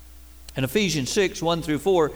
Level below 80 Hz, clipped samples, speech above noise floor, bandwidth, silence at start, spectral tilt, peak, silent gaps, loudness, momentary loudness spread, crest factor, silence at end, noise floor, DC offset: -46 dBFS; under 0.1%; 22 dB; over 20 kHz; 0 s; -4.5 dB/octave; -10 dBFS; none; -23 LUFS; 6 LU; 14 dB; 0 s; -45 dBFS; 0.3%